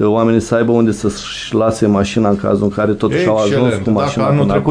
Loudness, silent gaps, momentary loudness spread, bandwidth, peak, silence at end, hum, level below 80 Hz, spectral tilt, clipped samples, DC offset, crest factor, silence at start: -14 LUFS; none; 3 LU; 10.5 kHz; 0 dBFS; 0 s; none; -40 dBFS; -6.5 dB/octave; under 0.1%; under 0.1%; 14 dB; 0 s